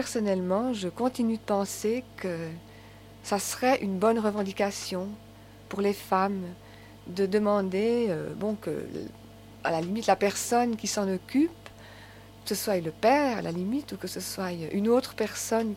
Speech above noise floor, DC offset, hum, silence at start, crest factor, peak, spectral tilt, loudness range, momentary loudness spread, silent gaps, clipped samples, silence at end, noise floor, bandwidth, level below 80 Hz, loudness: 21 dB; under 0.1%; 50 Hz at -55 dBFS; 0 s; 20 dB; -8 dBFS; -4.5 dB/octave; 2 LU; 15 LU; none; under 0.1%; 0 s; -49 dBFS; 16.5 kHz; -60 dBFS; -28 LUFS